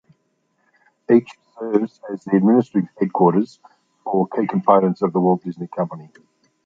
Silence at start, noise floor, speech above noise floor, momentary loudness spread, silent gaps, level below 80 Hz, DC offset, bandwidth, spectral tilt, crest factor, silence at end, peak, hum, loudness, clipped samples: 1.1 s; -68 dBFS; 49 dB; 14 LU; none; -66 dBFS; under 0.1%; 7.4 kHz; -10 dB/octave; 18 dB; 0.6 s; -2 dBFS; none; -19 LUFS; under 0.1%